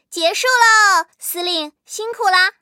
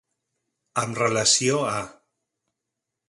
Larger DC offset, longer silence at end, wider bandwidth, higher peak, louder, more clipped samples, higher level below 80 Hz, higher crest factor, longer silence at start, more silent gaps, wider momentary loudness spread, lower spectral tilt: neither; second, 0.1 s vs 1.15 s; first, 16.5 kHz vs 11.5 kHz; first, 0 dBFS vs -6 dBFS; first, -14 LUFS vs -22 LUFS; neither; second, -78 dBFS vs -62 dBFS; about the same, 16 dB vs 20 dB; second, 0.1 s vs 0.75 s; neither; first, 16 LU vs 13 LU; second, 2.5 dB/octave vs -2.5 dB/octave